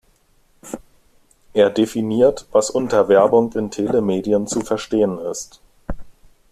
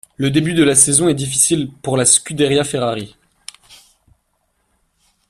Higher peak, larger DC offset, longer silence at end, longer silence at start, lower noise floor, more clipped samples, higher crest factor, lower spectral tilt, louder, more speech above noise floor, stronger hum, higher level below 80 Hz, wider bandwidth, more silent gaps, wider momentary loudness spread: about the same, -2 dBFS vs 0 dBFS; neither; second, 0.4 s vs 1.55 s; first, 0.65 s vs 0.2 s; second, -57 dBFS vs -66 dBFS; neither; about the same, 18 dB vs 18 dB; first, -5.5 dB/octave vs -3.5 dB/octave; second, -18 LUFS vs -14 LUFS; second, 40 dB vs 51 dB; neither; first, -44 dBFS vs -50 dBFS; second, 14 kHz vs 16 kHz; neither; first, 21 LU vs 12 LU